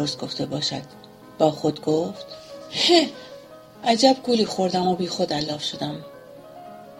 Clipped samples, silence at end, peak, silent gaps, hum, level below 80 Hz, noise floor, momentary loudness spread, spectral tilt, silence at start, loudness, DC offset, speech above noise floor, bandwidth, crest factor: under 0.1%; 0 s; -2 dBFS; none; none; -62 dBFS; -44 dBFS; 24 LU; -4.5 dB/octave; 0 s; -22 LUFS; under 0.1%; 21 dB; 16 kHz; 22 dB